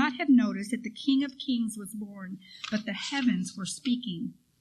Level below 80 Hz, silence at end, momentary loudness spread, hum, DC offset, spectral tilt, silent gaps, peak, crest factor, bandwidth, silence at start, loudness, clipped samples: -72 dBFS; 0.3 s; 16 LU; none; under 0.1%; -4.5 dB/octave; none; -14 dBFS; 16 dB; 13 kHz; 0 s; -29 LUFS; under 0.1%